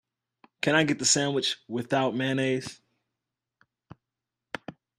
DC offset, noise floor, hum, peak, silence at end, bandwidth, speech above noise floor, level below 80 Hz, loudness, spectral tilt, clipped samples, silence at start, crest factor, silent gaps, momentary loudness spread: under 0.1%; -88 dBFS; none; -8 dBFS; 0.3 s; 14 kHz; 61 dB; -70 dBFS; -26 LUFS; -3 dB/octave; under 0.1%; 0.65 s; 22 dB; none; 18 LU